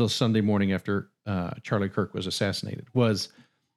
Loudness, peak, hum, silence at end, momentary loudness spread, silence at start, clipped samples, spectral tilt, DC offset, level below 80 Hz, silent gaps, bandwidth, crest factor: -27 LUFS; -10 dBFS; none; 0.5 s; 8 LU; 0 s; under 0.1%; -6 dB/octave; under 0.1%; -62 dBFS; none; 13.5 kHz; 18 dB